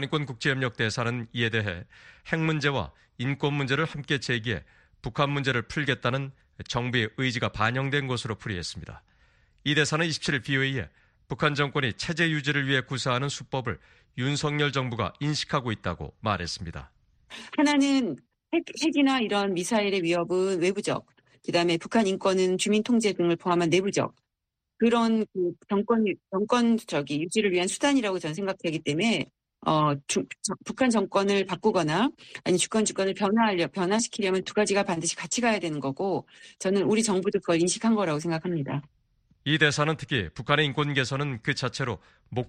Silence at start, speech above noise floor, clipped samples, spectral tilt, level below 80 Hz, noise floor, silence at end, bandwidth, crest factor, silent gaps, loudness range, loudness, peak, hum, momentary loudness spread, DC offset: 0 s; 58 dB; under 0.1%; -4.5 dB/octave; -56 dBFS; -84 dBFS; 0 s; 13 kHz; 20 dB; none; 3 LU; -26 LUFS; -6 dBFS; none; 10 LU; under 0.1%